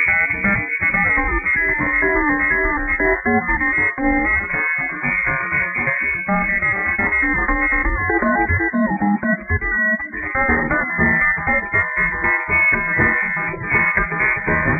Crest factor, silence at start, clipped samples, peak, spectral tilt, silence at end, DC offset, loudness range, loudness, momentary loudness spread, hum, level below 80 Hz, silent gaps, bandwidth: 16 dB; 0 s; under 0.1%; -2 dBFS; -10 dB/octave; 0 s; under 0.1%; 2 LU; -17 LUFS; 4 LU; none; -32 dBFS; none; 10.5 kHz